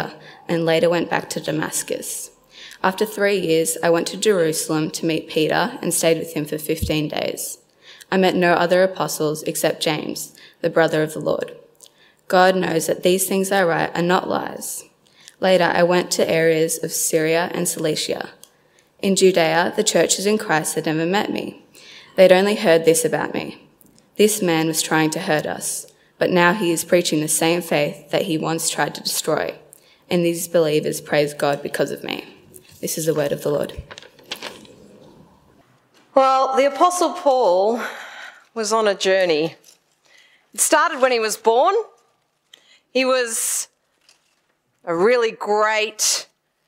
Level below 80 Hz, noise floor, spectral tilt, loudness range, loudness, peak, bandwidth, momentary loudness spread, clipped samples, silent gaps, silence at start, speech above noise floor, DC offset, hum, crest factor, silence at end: -54 dBFS; -67 dBFS; -3.5 dB/octave; 4 LU; -19 LUFS; 0 dBFS; 16.5 kHz; 13 LU; under 0.1%; none; 0 s; 48 dB; under 0.1%; none; 20 dB; 0.45 s